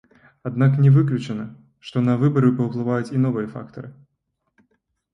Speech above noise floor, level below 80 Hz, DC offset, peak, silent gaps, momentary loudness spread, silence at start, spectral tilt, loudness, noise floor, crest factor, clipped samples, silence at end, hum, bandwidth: 55 dB; -60 dBFS; under 0.1%; -6 dBFS; none; 21 LU; 0.45 s; -9.5 dB/octave; -20 LUFS; -75 dBFS; 16 dB; under 0.1%; 1.2 s; none; 7.2 kHz